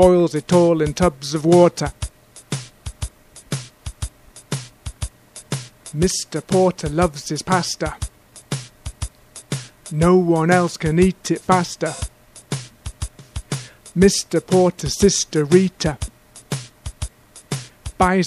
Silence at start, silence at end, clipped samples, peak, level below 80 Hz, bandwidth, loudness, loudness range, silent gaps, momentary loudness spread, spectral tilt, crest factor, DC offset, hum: 0 s; 0 s; under 0.1%; 0 dBFS; -36 dBFS; 14 kHz; -19 LUFS; 9 LU; none; 18 LU; -5 dB/octave; 20 dB; under 0.1%; none